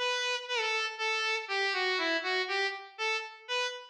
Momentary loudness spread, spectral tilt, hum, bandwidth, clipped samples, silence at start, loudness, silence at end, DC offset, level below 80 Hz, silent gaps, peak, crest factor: 5 LU; 3 dB/octave; none; 11.5 kHz; under 0.1%; 0 s; -30 LUFS; 0 s; under 0.1%; under -90 dBFS; none; -18 dBFS; 14 dB